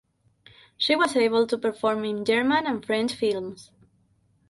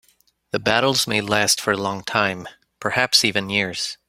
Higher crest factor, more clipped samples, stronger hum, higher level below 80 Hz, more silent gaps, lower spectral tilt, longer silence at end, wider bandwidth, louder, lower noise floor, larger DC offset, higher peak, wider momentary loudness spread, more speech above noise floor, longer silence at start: about the same, 18 dB vs 22 dB; neither; neither; second, -66 dBFS vs -58 dBFS; neither; first, -4 dB/octave vs -2.5 dB/octave; first, 0.85 s vs 0.15 s; second, 11.5 kHz vs 16 kHz; second, -24 LUFS vs -19 LUFS; first, -65 dBFS vs -61 dBFS; neither; second, -8 dBFS vs 0 dBFS; about the same, 6 LU vs 8 LU; about the same, 41 dB vs 40 dB; first, 0.8 s vs 0.55 s